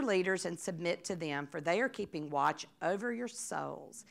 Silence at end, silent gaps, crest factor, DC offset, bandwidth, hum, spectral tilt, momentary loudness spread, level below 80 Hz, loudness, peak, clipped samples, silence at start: 0.1 s; none; 18 dB; under 0.1%; 15.5 kHz; none; -4 dB/octave; 7 LU; -78 dBFS; -36 LUFS; -18 dBFS; under 0.1%; 0 s